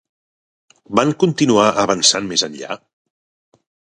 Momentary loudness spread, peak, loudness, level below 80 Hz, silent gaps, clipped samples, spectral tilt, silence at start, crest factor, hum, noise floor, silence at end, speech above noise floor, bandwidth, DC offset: 15 LU; 0 dBFS; -15 LUFS; -58 dBFS; none; under 0.1%; -3.5 dB/octave; 0.9 s; 20 dB; none; under -90 dBFS; 1.2 s; over 74 dB; 11.5 kHz; under 0.1%